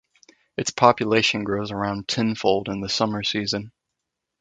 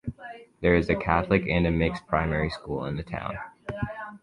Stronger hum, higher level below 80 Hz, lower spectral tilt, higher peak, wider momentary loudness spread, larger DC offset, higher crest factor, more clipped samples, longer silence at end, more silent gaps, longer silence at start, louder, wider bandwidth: neither; second, -56 dBFS vs -40 dBFS; second, -4 dB/octave vs -8 dB/octave; first, 0 dBFS vs -6 dBFS; second, 9 LU vs 14 LU; neither; about the same, 24 dB vs 20 dB; neither; first, 0.7 s vs 0.05 s; neither; first, 0.6 s vs 0.05 s; first, -22 LUFS vs -26 LUFS; second, 9.4 kHz vs 10.5 kHz